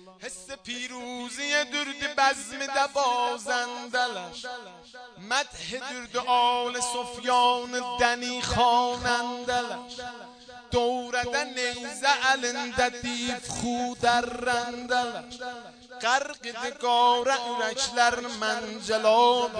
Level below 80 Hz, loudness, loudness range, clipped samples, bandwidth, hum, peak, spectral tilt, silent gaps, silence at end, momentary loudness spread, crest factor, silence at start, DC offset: -56 dBFS; -26 LUFS; 4 LU; under 0.1%; 10 kHz; none; -6 dBFS; -2 dB/octave; none; 0 s; 16 LU; 22 dB; 0 s; under 0.1%